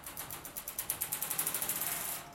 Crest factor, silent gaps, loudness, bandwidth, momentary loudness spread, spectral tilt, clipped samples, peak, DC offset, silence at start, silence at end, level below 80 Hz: 24 dB; none; -35 LUFS; 17 kHz; 9 LU; -0.5 dB/octave; under 0.1%; -14 dBFS; under 0.1%; 0 s; 0 s; -64 dBFS